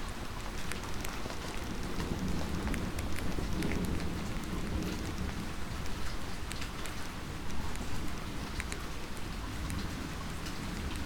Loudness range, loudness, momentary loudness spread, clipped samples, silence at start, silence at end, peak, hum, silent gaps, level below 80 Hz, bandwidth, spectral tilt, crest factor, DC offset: 4 LU; -39 LUFS; 5 LU; under 0.1%; 0 s; 0 s; -16 dBFS; none; none; -42 dBFS; 19.5 kHz; -5 dB/octave; 20 dB; under 0.1%